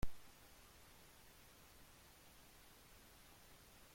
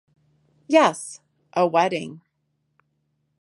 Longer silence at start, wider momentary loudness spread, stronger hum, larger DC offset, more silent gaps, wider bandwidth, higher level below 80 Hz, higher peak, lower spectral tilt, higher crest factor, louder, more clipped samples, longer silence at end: second, 0 s vs 0.7 s; second, 0 LU vs 18 LU; neither; neither; neither; first, 16.5 kHz vs 11.5 kHz; first, -60 dBFS vs -76 dBFS; second, -28 dBFS vs -2 dBFS; about the same, -4 dB/octave vs -4.5 dB/octave; about the same, 22 dB vs 22 dB; second, -63 LUFS vs -21 LUFS; neither; second, 0 s vs 1.25 s